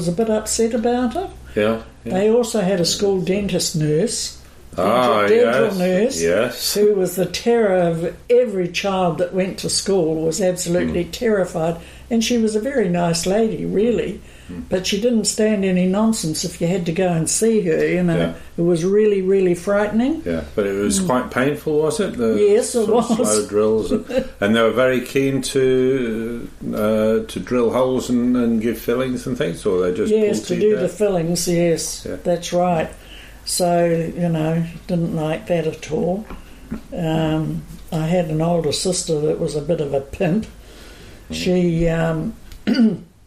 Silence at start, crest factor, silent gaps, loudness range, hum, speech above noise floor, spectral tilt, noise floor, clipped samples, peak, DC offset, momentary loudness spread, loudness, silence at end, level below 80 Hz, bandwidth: 0 s; 14 dB; none; 4 LU; none; 21 dB; -5 dB/octave; -39 dBFS; under 0.1%; -4 dBFS; under 0.1%; 8 LU; -19 LUFS; 0.2 s; -42 dBFS; 15.5 kHz